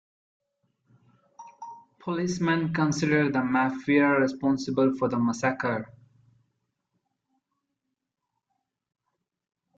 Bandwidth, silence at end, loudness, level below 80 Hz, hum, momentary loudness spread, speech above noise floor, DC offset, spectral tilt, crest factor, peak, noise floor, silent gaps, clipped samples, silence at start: 8 kHz; 3.85 s; -25 LUFS; -66 dBFS; none; 19 LU; 58 dB; under 0.1%; -6 dB/octave; 18 dB; -10 dBFS; -83 dBFS; none; under 0.1%; 1.4 s